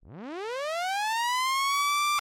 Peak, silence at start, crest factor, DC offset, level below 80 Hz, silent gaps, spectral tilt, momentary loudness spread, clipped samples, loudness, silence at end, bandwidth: -20 dBFS; 0.05 s; 8 dB; under 0.1%; -72 dBFS; none; 0 dB/octave; 11 LU; under 0.1%; -27 LUFS; 0 s; 16.5 kHz